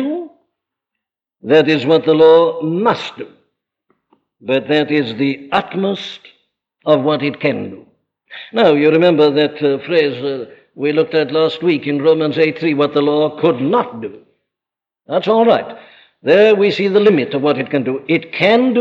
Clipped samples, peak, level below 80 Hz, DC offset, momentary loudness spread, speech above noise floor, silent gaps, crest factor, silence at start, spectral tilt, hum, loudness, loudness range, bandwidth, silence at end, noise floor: under 0.1%; -2 dBFS; -64 dBFS; under 0.1%; 15 LU; 73 dB; none; 14 dB; 0 s; -7 dB/octave; none; -14 LUFS; 5 LU; 7.4 kHz; 0 s; -87 dBFS